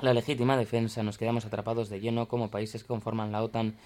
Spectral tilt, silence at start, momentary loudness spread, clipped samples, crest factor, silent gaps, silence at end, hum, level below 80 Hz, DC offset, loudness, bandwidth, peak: -7 dB/octave; 0 s; 7 LU; under 0.1%; 18 dB; none; 0.1 s; none; -64 dBFS; under 0.1%; -31 LUFS; 15 kHz; -10 dBFS